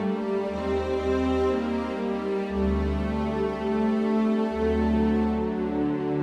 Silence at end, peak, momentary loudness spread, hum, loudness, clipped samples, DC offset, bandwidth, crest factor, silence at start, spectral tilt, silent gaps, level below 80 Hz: 0 s; -12 dBFS; 4 LU; none; -26 LUFS; under 0.1%; under 0.1%; 8.6 kHz; 12 dB; 0 s; -8 dB/octave; none; -38 dBFS